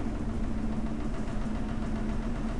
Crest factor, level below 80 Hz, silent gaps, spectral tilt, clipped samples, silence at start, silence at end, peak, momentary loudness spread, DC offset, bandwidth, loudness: 10 dB; -34 dBFS; none; -7.5 dB/octave; under 0.1%; 0 s; 0 s; -20 dBFS; 2 LU; under 0.1%; 11 kHz; -34 LUFS